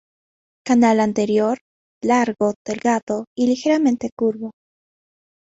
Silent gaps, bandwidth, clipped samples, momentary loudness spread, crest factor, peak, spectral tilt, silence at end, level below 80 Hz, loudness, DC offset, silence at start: 1.61-2.01 s, 2.56-2.65 s, 3.02-3.07 s, 3.27-3.36 s, 4.12-4.17 s; 8 kHz; under 0.1%; 10 LU; 14 dB; -6 dBFS; -5.5 dB/octave; 1.05 s; -62 dBFS; -19 LUFS; under 0.1%; 0.65 s